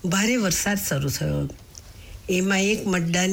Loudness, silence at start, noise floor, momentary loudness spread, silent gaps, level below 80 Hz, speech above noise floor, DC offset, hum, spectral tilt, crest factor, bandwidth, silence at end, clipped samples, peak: -23 LUFS; 0.05 s; -43 dBFS; 22 LU; none; -44 dBFS; 20 dB; under 0.1%; none; -4 dB/octave; 12 dB; 19.5 kHz; 0 s; under 0.1%; -12 dBFS